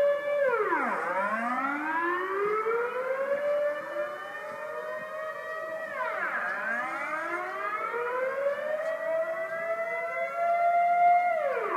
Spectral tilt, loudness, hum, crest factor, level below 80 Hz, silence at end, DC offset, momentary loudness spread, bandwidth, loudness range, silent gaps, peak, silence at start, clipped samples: -4.5 dB/octave; -29 LUFS; none; 14 dB; -84 dBFS; 0 s; under 0.1%; 11 LU; 15 kHz; 5 LU; none; -14 dBFS; 0 s; under 0.1%